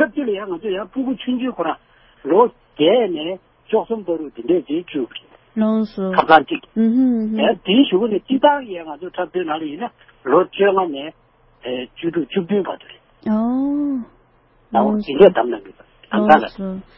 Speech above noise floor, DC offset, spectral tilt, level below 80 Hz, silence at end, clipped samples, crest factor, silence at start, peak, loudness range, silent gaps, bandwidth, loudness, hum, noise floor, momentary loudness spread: 37 dB; under 0.1%; -8.5 dB/octave; -56 dBFS; 0.15 s; under 0.1%; 18 dB; 0 s; 0 dBFS; 5 LU; none; 5.8 kHz; -18 LUFS; none; -55 dBFS; 16 LU